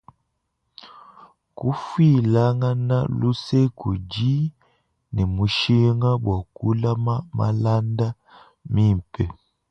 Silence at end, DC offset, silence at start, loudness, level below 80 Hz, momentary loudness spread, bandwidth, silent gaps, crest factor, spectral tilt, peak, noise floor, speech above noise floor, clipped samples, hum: 0.4 s; under 0.1%; 0.85 s; -22 LUFS; -42 dBFS; 10 LU; 7.6 kHz; none; 16 dB; -8 dB/octave; -6 dBFS; -74 dBFS; 54 dB; under 0.1%; none